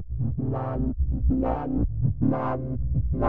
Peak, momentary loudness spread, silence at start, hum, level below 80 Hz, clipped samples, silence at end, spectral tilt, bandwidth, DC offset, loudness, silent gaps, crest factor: -10 dBFS; 4 LU; 0 s; none; -30 dBFS; under 0.1%; 0 s; -12.5 dB/octave; 3.3 kHz; 2%; -27 LUFS; none; 14 dB